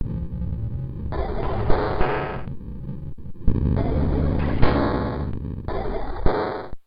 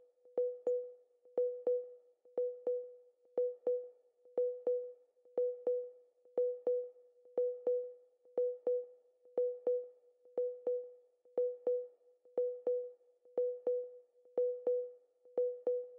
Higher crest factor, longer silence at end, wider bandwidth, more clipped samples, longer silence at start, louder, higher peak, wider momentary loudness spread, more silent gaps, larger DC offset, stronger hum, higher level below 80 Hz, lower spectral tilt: first, 22 dB vs 14 dB; about the same, 0.05 s vs 0 s; first, 5.2 kHz vs 1.9 kHz; neither; second, 0 s vs 0.25 s; first, -26 LUFS vs -39 LUFS; first, 0 dBFS vs -24 dBFS; about the same, 12 LU vs 13 LU; neither; neither; neither; first, -28 dBFS vs under -90 dBFS; first, -10.5 dB/octave vs -3.5 dB/octave